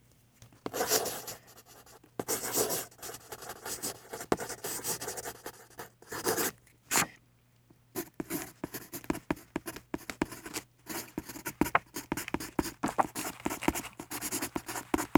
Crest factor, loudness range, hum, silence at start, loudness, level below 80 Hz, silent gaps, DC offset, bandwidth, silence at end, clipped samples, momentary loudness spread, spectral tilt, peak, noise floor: 32 dB; 5 LU; none; 0.4 s; -35 LUFS; -58 dBFS; none; under 0.1%; over 20 kHz; 0 s; under 0.1%; 14 LU; -2.5 dB/octave; -4 dBFS; -65 dBFS